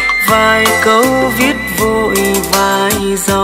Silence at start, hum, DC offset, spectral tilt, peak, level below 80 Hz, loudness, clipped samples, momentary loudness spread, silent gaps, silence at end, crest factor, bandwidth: 0 s; none; under 0.1%; -3 dB/octave; 0 dBFS; -34 dBFS; -11 LUFS; under 0.1%; 4 LU; none; 0 s; 12 dB; 16.5 kHz